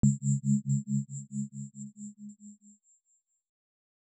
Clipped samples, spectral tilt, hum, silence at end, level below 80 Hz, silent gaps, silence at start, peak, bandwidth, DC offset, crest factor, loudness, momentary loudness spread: under 0.1%; -9.5 dB/octave; none; 1.5 s; -58 dBFS; none; 0.05 s; -14 dBFS; 8.6 kHz; under 0.1%; 20 dB; -32 LUFS; 20 LU